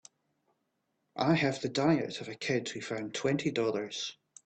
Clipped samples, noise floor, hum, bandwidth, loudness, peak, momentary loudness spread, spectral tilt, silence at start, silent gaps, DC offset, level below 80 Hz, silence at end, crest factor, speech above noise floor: under 0.1%; -80 dBFS; none; 9 kHz; -32 LUFS; -14 dBFS; 10 LU; -5 dB/octave; 1.15 s; none; under 0.1%; -70 dBFS; 0.3 s; 18 dB; 49 dB